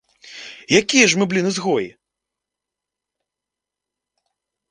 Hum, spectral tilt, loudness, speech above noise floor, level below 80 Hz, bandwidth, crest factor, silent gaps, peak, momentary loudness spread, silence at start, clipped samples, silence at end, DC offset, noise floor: none; -3 dB/octave; -17 LUFS; 69 dB; -64 dBFS; 10 kHz; 22 dB; none; 0 dBFS; 22 LU; 0.25 s; under 0.1%; 2.8 s; under 0.1%; -86 dBFS